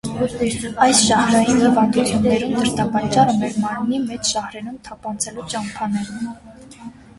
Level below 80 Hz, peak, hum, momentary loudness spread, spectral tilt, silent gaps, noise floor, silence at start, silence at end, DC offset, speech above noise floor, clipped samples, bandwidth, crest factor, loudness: -46 dBFS; -2 dBFS; none; 17 LU; -4 dB/octave; none; -39 dBFS; 0.05 s; 0.25 s; under 0.1%; 20 dB; under 0.1%; 11.5 kHz; 18 dB; -18 LUFS